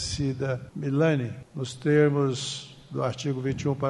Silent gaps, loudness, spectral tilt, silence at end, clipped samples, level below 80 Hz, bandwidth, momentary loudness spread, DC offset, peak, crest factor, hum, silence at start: none; -27 LUFS; -6 dB/octave; 0 s; under 0.1%; -52 dBFS; 11 kHz; 14 LU; under 0.1%; -10 dBFS; 16 dB; none; 0 s